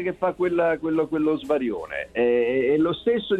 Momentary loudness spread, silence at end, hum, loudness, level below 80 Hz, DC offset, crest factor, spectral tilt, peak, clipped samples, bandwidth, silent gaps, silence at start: 5 LU; 0 s; none; -23 LUFS; -56 dBFS; under 0.1%; 14 dB; -7.5 dB/octave; -10 dBFS; under 0.1%; 8.6 kHz; none; 0 s